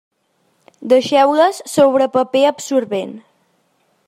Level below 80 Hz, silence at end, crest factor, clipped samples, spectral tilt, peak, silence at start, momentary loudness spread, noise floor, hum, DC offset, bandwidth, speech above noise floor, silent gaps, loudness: -68 dBFS; 0.9 s; 16 dB; under 0.1%; -4 dB/octave; -2 dBFS; 0.8 s; 11 LU; -63 dBFS; none; under 0.1%; 14.5 kHz; 49 dB; none; -15 LUFS